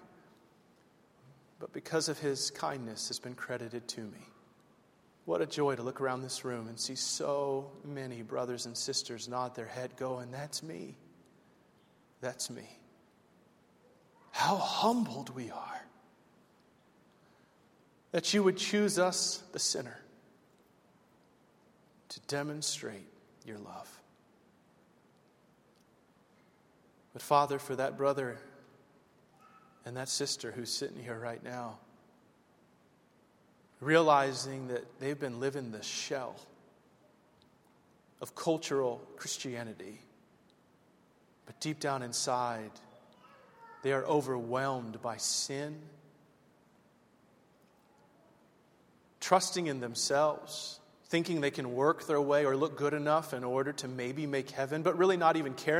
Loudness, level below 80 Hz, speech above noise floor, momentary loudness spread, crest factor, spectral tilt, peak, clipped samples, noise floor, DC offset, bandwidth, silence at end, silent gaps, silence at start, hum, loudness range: -34 LUFS; -80 dBFS; 33 dB; 18 LU; 26 dB; -3.5 dB/octave; -10 dBFS; under 0.1%; -67 dBFS; under 0.1%; 16 kHz; 0 s; none; 0 s; none; 10 LU